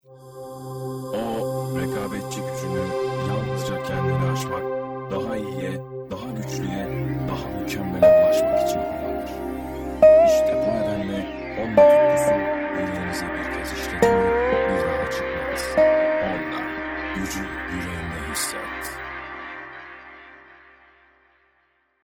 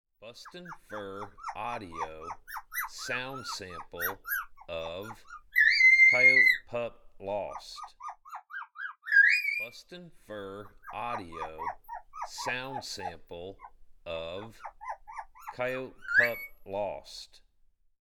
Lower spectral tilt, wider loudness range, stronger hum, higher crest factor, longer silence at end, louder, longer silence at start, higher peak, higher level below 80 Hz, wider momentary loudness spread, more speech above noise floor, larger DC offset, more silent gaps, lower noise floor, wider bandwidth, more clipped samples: first, -5.5 dB/octave vs -2.5 dB/octave; second, 11 LU vs 16 LU; neither; about the same, 20 dB vs 20 dB; first, 1.7 s vs 0.8 s; first, -23 LUFS vs -26 LUFS; about the same, 0.1 s vs 0.2 s; first, -2 dBFS vs -12 dBFS; first, -44 dBFS vs -60 dBFS; second, 16 LU vs 24 LU; first, 44 dB vs 32 dB; neither; neither; about the same, -66 dBFS vs -65 dBFS; first, over 20 kHz vs 18 kHz; neither